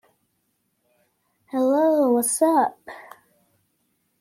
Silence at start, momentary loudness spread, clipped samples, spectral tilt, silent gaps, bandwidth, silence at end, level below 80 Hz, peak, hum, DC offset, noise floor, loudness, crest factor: 1.55 s; 22 LU; under 0.1%; -3.5 dB/octave; none; 16 kHz; 1.2 s; -76 dBFS; -8 dBFS; none; under 0.1%; -72 dBFS; -20 LUFS; 18 dB